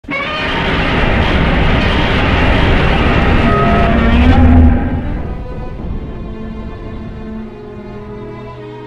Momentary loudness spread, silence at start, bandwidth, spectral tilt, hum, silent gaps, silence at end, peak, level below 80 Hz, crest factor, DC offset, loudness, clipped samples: 18 LU; 0.05 s; 7.6 kHz; -7.5 dB/octave; none; none; 0 s; 0 dBFS; -16 dBFS; 12 dB; under 0.1%; -12 LUFS; under 0.1%